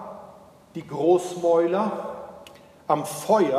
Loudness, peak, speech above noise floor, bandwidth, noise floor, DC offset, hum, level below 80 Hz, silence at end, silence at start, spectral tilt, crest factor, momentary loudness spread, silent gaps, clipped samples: -23 LUFS; -6 dBFS; 27 dB; 15.5 kHz; -49 dBFS; under 0.1%; none; -68 dBFS; 0 s; 0 s; -5.5 dB/octave; 18 dB; 20 LU; none; under 0.1%